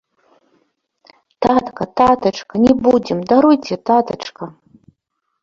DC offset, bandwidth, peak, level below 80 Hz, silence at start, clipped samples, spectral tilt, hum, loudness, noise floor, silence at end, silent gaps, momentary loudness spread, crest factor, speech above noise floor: under 0.1%; 7.4 kHz; 0 dBFS; -48 dBFS; 1.4 s; under 0.1%; -6.5 dB/octave; none; -15 LUFS; -72 dBFS; 0.9 s; none; 14 LU; 16 dB; 58 dB